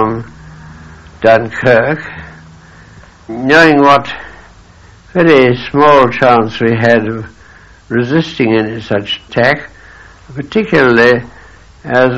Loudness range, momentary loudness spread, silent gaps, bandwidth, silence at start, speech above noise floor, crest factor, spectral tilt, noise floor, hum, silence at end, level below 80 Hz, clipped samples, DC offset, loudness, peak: 5 LU; 18 LU; none; 9.6 kHz; 0 s; 29 dB; 12 dB; -6.5 dB/octave; -39 dBFS; none; 0 s; -42 dBFS; 0.5%; under 0.1%; -10 LUFS; 0 dBFS